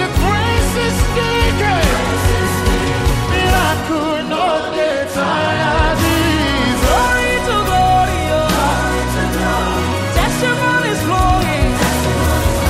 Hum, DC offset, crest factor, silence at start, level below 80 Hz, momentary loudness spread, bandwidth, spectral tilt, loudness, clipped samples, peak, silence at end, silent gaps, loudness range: none; under 0.1%; 12 dB; 0 s; -22 dBFS; 3 LU; 16 kHz; -4.5 dB/octave; -15 LUFS; under 0.1%; -2 dBFS; 0 s; none; 2 LU